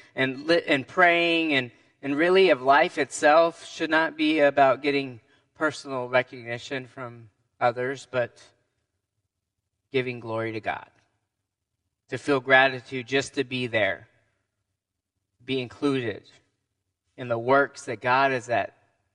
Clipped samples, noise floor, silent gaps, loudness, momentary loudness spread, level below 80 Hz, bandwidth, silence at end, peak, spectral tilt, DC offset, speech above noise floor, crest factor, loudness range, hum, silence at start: under 0.1%; -83 dBFS; none; -24 LUFS; 15 LU; -72 dBFS; 11 kHz; 0.45 s; -2 dBFS; -4.5 dB/octave; under 0.1%; 59 dB; 24 dB; 12 LU; none; 0.15 s